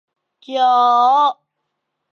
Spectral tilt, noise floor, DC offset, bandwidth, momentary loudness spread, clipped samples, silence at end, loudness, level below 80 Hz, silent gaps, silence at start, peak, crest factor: -1.5 dB/octave; -75 dBFS; under 0.1%; 7 kHz; 7 LU; under 0.1%; 0.85 s; -14 LUFS; -86 dBFS; none; 0.5 s; -4 dBFS; 12 dB